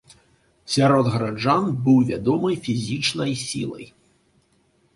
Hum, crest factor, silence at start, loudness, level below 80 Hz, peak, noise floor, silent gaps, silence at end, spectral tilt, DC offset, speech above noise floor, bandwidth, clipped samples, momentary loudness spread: none; 18 dB; 0.65 s; -21 LUFS; -54 dBFS; -4 dBFS; -63 dBFS; none; 1.1 s; -5.5 dB/octave; under 0.1%; 42 dB; 11.5 kHz; under 0.1%; 10 LU